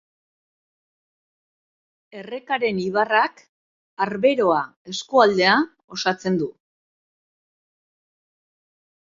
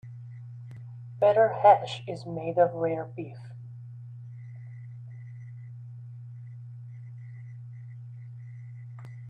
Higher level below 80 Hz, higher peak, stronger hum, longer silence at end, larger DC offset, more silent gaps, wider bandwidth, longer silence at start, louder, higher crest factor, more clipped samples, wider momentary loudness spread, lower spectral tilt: about the same, -68 dBFS vs -72 dBFS; first, -2 dBFS vs -6 dBFS; neither; first, 2.7 s vs 0 s; neither; first, 3.49-3.97 s, 4.76-4.85 s, 5.84-5.88 s vs none; second, 7.6 kHz vs 8.8 kHz; first, 2.15 s vs 0.05 s; first, -21 LUFS vs -25 LUFS; about the same, 22 dB vs 24 dB; neither; second, 14 LU vs 22 LU; second, -4.5 dB/octave vs -7.5 dB/octave